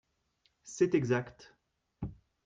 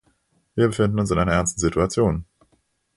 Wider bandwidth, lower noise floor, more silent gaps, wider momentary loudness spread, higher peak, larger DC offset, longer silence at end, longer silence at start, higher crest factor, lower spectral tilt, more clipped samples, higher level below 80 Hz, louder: second, 9.2 kHz vs 11.5 kHz; first, -76 dBFS vs -66 dBFS; neither; first, 18 LU vs 4 LU; second, -16 dBFS vs -6 dBFS; neither; second, 0.35 s vs 0.75 s; about the same, 0.65 s vs 0.55 s; about the same, 20 dB vs 18 dB; about the same, -6.5 dB/octave vs -5.5 dB/octave; neither; second, -60 dBFS vs -38 dBFS; second, -31 LUFS vs -22 LUFS